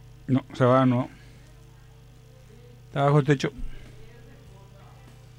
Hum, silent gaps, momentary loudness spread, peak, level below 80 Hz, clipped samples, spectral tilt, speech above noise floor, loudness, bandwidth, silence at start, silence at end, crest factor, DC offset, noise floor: none; none; 22 LU; -8 dBFS; -46 dBFS; under 0.1%; -7.5 dB/octave; 28 dB; -24 LUFS; 10 kHz; 0.3 s; 0.9 s; 20 dB; under 0.1%; -50 dBFS